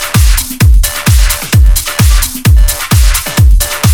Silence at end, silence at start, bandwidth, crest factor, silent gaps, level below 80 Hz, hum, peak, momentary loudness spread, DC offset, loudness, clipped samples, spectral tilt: 0 s; 0 s; 20 kHz; 6 dB; none; -8 dBFS; none; 0 dBFS; 1 LU; under 0.1%; -9 LUFS; 0.7%; -4 dB/octave